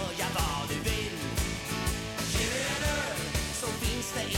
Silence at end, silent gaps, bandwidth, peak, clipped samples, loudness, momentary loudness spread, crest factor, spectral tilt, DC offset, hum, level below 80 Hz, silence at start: 0 s; none; 17.5 kHz; -18 dBFS; under 0.1%; -31 LUFS; 3 LU; 14 dB; -3.5 dB/octave; under 0.1%; none; -38 dBFS; 0 s